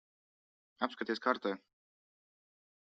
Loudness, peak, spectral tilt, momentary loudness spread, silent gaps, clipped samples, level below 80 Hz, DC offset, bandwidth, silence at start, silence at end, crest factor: -37 LUFS; -14 dBFS; -2 dB/octave; 7 LU; none; under 0.1%; -86 dBFS; under 0.1%; 8 kHz; 0.8 s; 1.3 s; 26 dB